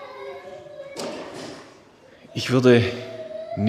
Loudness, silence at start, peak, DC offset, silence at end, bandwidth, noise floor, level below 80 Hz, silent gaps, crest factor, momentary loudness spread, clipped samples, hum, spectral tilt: -22 LUFS; 0 s; -2 dBFS; under 0.1%; 0 s; 14.5 kHz; -50 dBFS; -62 dBFS; none; 22 dB; 22 LU; under 0.1%; none; -6 dB/octave